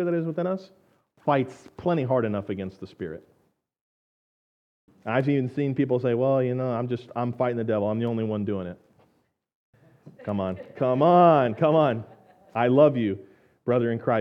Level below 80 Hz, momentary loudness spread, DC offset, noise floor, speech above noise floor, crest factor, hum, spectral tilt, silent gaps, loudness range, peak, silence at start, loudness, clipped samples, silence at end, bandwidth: -70 dBFS; 16 LU; under 0.1%; -69 dBFS; 45 dB; 20 dB; none; -9.5 dB/octave; 3.81-4.88 s, 9.55-9.73 s; 9 LU; -4 dBFS; 0 s; -24 LUFS; under 0.1%; 0 s; 7.4 kHz